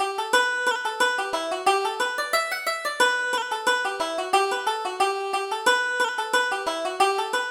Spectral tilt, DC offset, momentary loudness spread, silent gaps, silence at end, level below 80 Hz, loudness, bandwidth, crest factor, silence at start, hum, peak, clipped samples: 0 dB/octave; under 0.1%; 5 LU; none; 0 s; -68 dBFS; -24 LUFS; 19 kHz; 18 dB; 0 s; none; -6 dBFS; under 0.1%